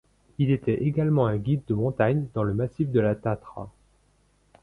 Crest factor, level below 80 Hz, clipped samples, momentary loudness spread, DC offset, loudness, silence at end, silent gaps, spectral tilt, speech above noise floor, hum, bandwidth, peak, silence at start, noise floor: 16 dB; -52 dBFS; under 0.1%; 13 LU; under 0.1%; -25 LUFS; 0.95 s; none; -10 dB/octave; 40 dB; 50 Hz at -45 dBFS; 4.1 kHz; -10 dBFS; 0.4 s; -64 dBFS